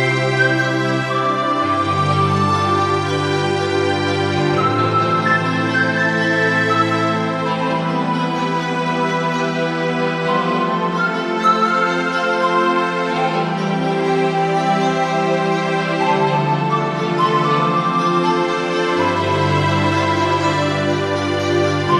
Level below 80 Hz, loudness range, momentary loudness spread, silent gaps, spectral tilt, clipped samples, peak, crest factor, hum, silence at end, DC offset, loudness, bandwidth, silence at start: -62 dBFS; 2 LU; 4 LU; none; -6 dB/octave; under 0.1%; -2 dBFS; 14 dB; none; 0 s; under 0.1%; -17 LUFS; 12 kHz; 0 s